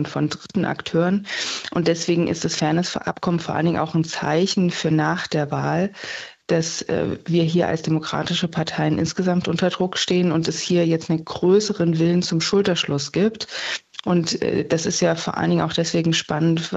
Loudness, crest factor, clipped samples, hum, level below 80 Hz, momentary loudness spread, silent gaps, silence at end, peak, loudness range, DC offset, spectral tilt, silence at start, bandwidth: -21 LUFS; 14 dB; under 0.1%; none; -56 dBFS; 5 LU; none; 0 s; -6 dBFS; 2 LU; under 0.1%; -5 dB/octave; 0 s; 8.2 kHz